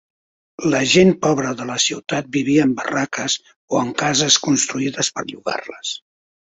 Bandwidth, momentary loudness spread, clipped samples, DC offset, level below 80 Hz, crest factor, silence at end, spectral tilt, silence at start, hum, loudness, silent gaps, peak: 8.2 kHz; 12 LU; under 0.1%; under 0.1%; -56 dBFS; 18 dB; 0.5 s; -3.5 dB/octave; 0.6 s; none; -18 LUFS; 3.56-3.68 s; -2 dBFS